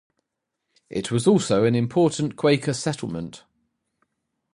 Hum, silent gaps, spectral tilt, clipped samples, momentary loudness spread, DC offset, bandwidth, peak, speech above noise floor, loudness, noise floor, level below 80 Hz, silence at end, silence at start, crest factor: none; none; -6 dB/octave; under 0.1%; 13 LU; under 0.1%; 11.5 kHz; -6 dBFS; 60 dB; -22 LUFS; -81 dBFS; -58 dBFS; 1.2 s; 0.9 s; 18 dB